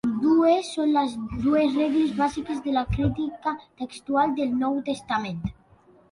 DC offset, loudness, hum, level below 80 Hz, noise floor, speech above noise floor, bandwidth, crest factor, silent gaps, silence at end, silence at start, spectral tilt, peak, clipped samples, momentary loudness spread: under 0.1%; -24 LUFS; none; -44 dBFS; -56 dBFS; 32 dB; 11 kHz; 16 dB; none; 0.6 s; 0.05 s; -6.5 dB/octave; -10 dBFS; under 0.1%; 11 LU